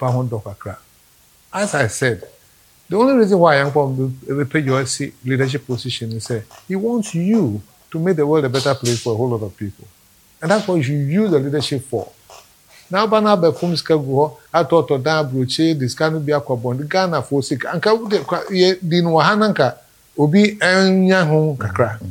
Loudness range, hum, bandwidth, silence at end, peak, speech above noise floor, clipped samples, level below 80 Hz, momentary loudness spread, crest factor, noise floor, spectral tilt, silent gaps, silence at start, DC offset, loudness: 5 LU; none; 18 kHz; 0 s; 0 dBFS; 35 dB; under 0.1%; -58 dBFS; 11 LU; 18 dB; -52 dBFS; -5.5 dB/octave; none; 0 s; under 0.1%; -17 LUFS